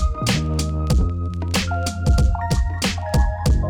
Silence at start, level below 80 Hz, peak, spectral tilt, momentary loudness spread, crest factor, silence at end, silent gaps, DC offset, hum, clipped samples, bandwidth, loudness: 0 s; -22 dBFS; -8 dBFS; -5 dB/octave; 4 LU; 12 dB; 0 s; none; under 0.1%; none; under 0.1%; 18 kHz; -21 LUFS